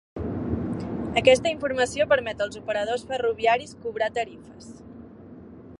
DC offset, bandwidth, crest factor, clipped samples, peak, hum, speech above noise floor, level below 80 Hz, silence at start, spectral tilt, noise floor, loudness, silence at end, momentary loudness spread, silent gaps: under 0.1%; 11.5 kHz; 22 dB; under 0.1%; -4 dBFS; none; 20 dB; -48 dBFS; 0.15 s; -4.5 dB/octave; -44 dBFS; -25 LUFS; 0.05 s; 24 LU; none